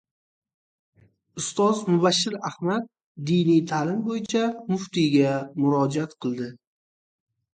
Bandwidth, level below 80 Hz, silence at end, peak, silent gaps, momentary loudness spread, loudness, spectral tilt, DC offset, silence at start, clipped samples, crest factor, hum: 9.4 kHz; -68 dBFS; 1 s; -8 dBFS; 3.03-3.15 s; 11 LU; -24 LUFS; -5.5 dB/octave; under 0.1%; 1.35 s; under 0.1%; 18 dB; none